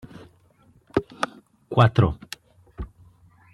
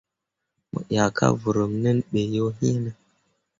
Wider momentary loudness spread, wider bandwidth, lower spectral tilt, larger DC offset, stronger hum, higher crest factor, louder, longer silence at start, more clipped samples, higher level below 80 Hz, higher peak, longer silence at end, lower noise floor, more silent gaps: first, 22 LU vs 11 LU; first, 12 kHz vs 7.6 kHz; about the same, -7 dB/octave vs -6.5 dB/octave; neither; neither; about the same, 24 dB vs 20 dB; about the same, -23 LUFS vs -24 LUFS; first, 0.95 s vs 0.75 s; neither; first, -44 dBFS vs -54 dBFS; about the same, -2 dBFS vs -4 dBFS; about the same, 0.7 s vs 0.65 s; second, -58 dBFS vs -83 dBFS; neither